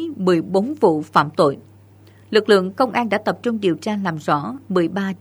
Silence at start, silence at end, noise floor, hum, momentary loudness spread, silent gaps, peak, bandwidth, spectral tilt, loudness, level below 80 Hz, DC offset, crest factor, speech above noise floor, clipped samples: 0 s; 0.05 s; -47 dBFS; none; 6 LU; none; 0 dBFS; over 20 kHz; -6.5 dB/octave; -19 LUFS; -64 dBFS; under 0.1%; 18 dB; 29 dB; under 0.1%